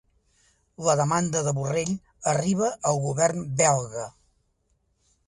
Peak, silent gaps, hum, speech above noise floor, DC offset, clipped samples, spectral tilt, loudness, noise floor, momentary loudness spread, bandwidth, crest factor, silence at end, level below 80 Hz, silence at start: -6 dBFS; none; none; 46 dB; under 0.1%; under 0.1%; -5 dB/octave; -25 LUFS; -70 dBFS; 8 LU; 11.5 kHz; 20 dB; 1.2 s; -58 dBFS; 0.8 s